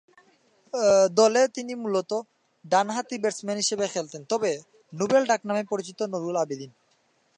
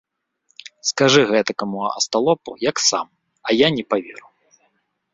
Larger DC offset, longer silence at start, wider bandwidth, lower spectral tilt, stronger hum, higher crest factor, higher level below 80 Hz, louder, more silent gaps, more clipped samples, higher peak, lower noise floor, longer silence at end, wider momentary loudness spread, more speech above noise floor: neither; about the same, 0.75 s vs 0.85 s; first, 10.5 kHz vs 8 kHz; about the same, -3.5 dB/octave vs -3 dB/octave; neither; about the same, 20 dB vs 20 dB; second, -74 dBFS vs -62 dBFS; second, -25 LUFS vs -19 LUFS; neither; neither; second, -6 dBFS vs -2 dBFS; about the same, -67 dBFS vs -67 dBFS; second, 0.7 s vs 0.95 s; about the same, 13 LU vs 11 LU; second, 42 dB vs 48 dB